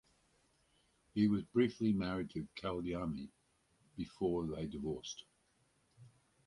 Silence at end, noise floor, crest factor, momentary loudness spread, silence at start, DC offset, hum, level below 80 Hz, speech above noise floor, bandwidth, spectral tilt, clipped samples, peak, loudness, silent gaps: 0.4 s; -76 dBFS; 20 dB; 14 LU; 1.15 s; under 0.1%; none; -62 dBFS; 38 dB; 11.5 kHz; -6.5 dB/octave; under 0.1%; -20 dBFS; -38 LUFS; none